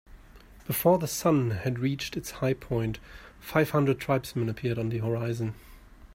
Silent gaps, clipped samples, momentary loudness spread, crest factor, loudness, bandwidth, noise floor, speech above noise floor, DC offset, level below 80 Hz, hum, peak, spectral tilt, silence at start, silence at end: none; under 0.1%; 11 LU; 20 dB; -28 LUFS; 16 kHz; -51 dBFS; 24 dB; under 0.1%; -52 dBFS; none; -8 dBFS; -6 dB/octave; 0.1 s; 0 s